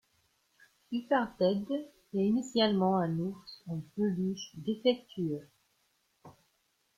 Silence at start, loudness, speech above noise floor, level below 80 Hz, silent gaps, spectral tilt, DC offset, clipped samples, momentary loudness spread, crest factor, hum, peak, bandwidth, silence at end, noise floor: 0.9 s; -32 LUFS; 44 dB; -70 dBFS; none; -6.5 dB/octave; under 0.1%; under 0.1%; 11 LU; 20 dB; none; -14 dBFS; 11.5 kHz; 0.65 s; -75 dBFS